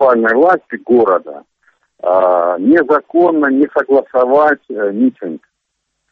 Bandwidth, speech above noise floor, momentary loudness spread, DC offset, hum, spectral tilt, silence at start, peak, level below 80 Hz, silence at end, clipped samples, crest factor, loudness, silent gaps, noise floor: 5.4 kHz; 59 dB; 9 LU; under 0.1%; none; -8.5 dB/octave; 0 s; 0 dBFS; -58 dBFS; 0.75 s; under 0.1%; 12 dB; -12 LUFS; none; -71 dBFS